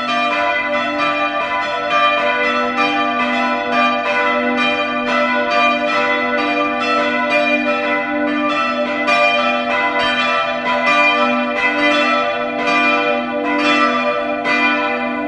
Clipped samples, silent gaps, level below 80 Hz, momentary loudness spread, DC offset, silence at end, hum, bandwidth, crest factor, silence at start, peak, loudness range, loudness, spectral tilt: under 0.1%; none; -52 dBFS; 4 LU; under 0.1%; 0 s; none; 10.5 kHz; 14 dB; 0 s; -2 dBFS; 2 LU; -15 LUFS; -3.5 dB/octave